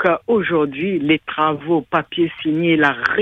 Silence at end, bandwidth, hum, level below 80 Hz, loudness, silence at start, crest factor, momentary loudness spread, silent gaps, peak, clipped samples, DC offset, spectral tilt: 0 s; 6.2 kHz; none; -56 dBFS; -18 LUFS; 0 s; 18 dB; 5 LU; none; 0 dBFS; under 0.1%; under 0.1%; -7.5 dB/octave